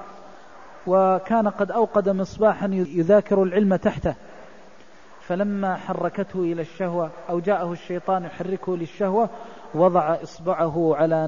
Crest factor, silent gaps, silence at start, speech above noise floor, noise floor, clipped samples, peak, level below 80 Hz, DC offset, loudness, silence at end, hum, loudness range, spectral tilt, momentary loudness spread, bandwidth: 18 dB; none; 0 s; 27 dB; -49 dBFS; under 0.1%; -6 dBFS; -52 dBFS; 0.5%; -23 LUFS; 0 s; none; 6 LU; -8.5 dB/octave; 10 LU; 7.4 kHz